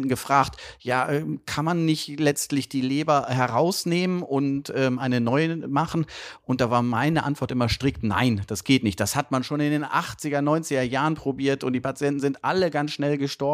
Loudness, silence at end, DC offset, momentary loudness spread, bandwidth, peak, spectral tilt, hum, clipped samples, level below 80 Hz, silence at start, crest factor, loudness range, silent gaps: -24 LUFS; 0 s; under 0.1%; 5 LU; 15.5 kHz; -4 dBFS; -5.5 dB/octave; none; under 0.1%; -50 dBFS; 0 s; 20 dB; 1 LU; none